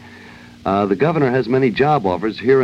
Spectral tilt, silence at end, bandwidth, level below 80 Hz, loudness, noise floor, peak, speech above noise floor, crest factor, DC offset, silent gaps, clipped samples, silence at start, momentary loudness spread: -8 dB/octave; 0 s; 7.2 kHz; -50 dBFS; -17 LUFS; -40 dBFS; -2 dBFS; 24 dB; 14 dB; under 0.1%; none; under 0.1%; 0 s; 5 LU